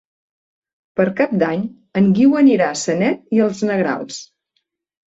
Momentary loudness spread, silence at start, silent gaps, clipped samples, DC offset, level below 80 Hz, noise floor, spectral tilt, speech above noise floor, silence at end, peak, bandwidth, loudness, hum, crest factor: 12 LU; 0.95 s; none; under 0.1%; under 0.1%; -60 dBFS; -71 dBFS; -6 dB/octave; 55 dB; 0.8 s; -2 dBFS; 8 kHz; -17 LUFS; none; 16 dB